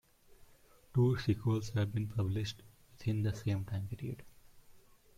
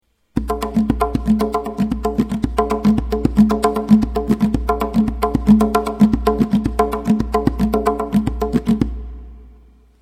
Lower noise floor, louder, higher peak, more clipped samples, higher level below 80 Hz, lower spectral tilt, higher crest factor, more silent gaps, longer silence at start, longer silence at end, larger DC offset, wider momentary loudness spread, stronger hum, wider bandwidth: first, -62 dBFS vs -47 dBFS; second, -36 LUFS vs -18 LUFS; second, -18 dBFS vs 0 dBFS; neither; second, -60 dBFS vs -28 dBFS; about the same, -7.5 dB/octave vs -7.5 dB/octave; about the same, 18 dB vs 18 dB; neither; about the same, 0.3 s vs 0.35 s; about the same, 0.4 s vs 0.5 s; neither; first, 12 LU vs 7 LU; neither; about the same, 15 kHz vs 15 kHz